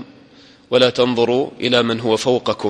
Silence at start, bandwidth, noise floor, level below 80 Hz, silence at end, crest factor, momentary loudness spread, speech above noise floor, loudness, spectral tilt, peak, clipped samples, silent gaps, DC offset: 0 s; 11.5 kHz; -47 dBFS; -58 dBFS; 0 s; 18 dB; 4 LU; 30 dB; -17 LUFS; -4.5 dB/octave; 0 dBFS; under 0.1%; none; under 0.1%